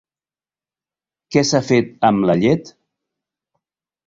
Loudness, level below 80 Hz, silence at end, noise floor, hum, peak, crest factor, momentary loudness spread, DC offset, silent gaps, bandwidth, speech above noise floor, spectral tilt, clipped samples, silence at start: -17 LUFS; -54 dBFS; 1.35 s; under -90 dBFS; none; -2 dBFS; 18 dB; 4 LU; under 0.1%; none; 7.8 kHz; over 74 dB; -5.5 dB/octave; under 0.1%; 1.3 s